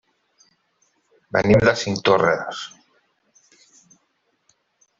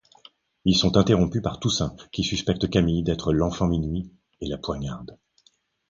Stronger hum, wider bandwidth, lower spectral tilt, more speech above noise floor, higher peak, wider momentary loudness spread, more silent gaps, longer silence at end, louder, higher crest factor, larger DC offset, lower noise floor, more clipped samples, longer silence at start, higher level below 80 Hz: neither; about the same, 7.8 kHz vs 7.6 kHz; about the same, -5.5 dB/octave vs -5.5 dB/octave; first, 51 dB vs 41 dB; about the same, -2 dBFS vs -2 dBFS; about the same, 16 LU vs 14 LU; neither; first, 2.3 s vs 0.75 s; first, -19 LUFS vs -24 LUFS; about the same, 20 dB vs 22 dB; neither; first, -69 dBFS vs -64 dBFS; neither; first, 1.35 s vs 0.65 s; second, -50 dBFS vs -40 dBFS